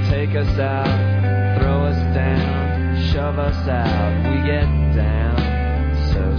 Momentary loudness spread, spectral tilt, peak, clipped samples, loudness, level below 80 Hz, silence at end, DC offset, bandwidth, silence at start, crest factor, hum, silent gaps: 2 LU; -9 dB/octave; -6 dBFS; under 0.1%; -19 LUFS; -22 dBFS; 0 s; under 0.1%; 5.4 kHz; 0 s; 12 dB; none; none